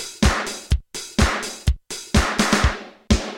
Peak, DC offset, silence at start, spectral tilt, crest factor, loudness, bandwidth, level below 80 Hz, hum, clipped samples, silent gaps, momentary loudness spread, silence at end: -4 dBFS; under 0.1%; 0 s; -4 dB/octave; 18 dB; -22 LUFS; 16.5 kHz; -26 dBFS; none; under 0.1%; none; 7 LU; 0 s